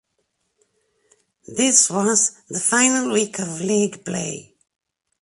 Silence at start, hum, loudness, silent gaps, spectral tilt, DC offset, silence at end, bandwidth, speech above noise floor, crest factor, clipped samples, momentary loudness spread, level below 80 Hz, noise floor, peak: 1.5 s; none; -18 LUFS; none; -2.5 dB/octave; under 0.1%; 0.8 s; 11.5 kHz; 52 dB; 22 dB; under 0.1%; 12 LU; -66 dBFS; -72 dBFS; 0 dBFS